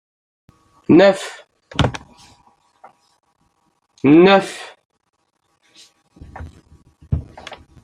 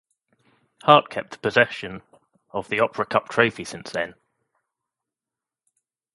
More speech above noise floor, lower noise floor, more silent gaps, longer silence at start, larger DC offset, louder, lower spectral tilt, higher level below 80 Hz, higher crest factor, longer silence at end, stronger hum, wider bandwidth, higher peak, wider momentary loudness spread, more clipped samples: second, 55 dB vs 67 dB; second, -67 dBFS vs -89 dBFS; first, 4.85-4.89 s vs none; about the same, 0.9 s vs 0.85 s; neither; first, -15 LUFS vs -22 LUFS; first, -6.5 dB/octave vs -4.5 dB/octave; first, -42 dBFS vs -64 dBFS; second, 18 dB vs 24 dB; second, 0.3 s vs 2.05 s; neither; about the same, 11 kHz vs 11.5 kHz; about the same, -2 dBFS vs 0 dBFS; first, 27 LU vs 17 LU; neither